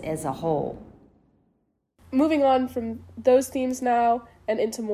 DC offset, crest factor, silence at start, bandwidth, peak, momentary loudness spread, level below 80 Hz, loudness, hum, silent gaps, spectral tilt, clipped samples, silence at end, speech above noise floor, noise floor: under 0.1%; 18 dB; 0 s; 16 kHz; -8 dBFS; 10 LU; -54 dBFS; -24 LUFS; none; none; -5.5 dB/octave; under 0.1%; 0 s; 48 dB; -71 dBFS